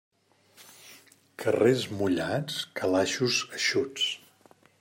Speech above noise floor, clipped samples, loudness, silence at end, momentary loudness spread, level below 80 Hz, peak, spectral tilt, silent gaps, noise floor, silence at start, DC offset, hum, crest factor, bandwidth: 33 dB; under 0.1%; -27 LUFS; 0.65 s; 9 LU; -72 dBFS; -10 dBFS; -4 dB/octave; none; -60 dBFS; 0.6 s; under 0.1%; none; 20 dB; 16 kHz